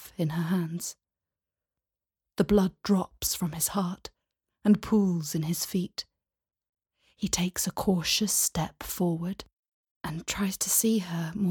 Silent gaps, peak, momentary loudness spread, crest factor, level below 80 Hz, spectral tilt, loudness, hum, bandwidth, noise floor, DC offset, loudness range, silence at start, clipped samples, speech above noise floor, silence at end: 6.69-6.73 s, 9.53-9.84 s, 9.91-10.01 s; -10 dBFS; 12 LU; 18 dB; -54 dBFS; -4.5 dB/octave; -28 LUFS; none; 19 kHz; under -90 dBFS; under 0.1%; 3 LU; 0 s; under 0.1%; over 62 dB; 0 s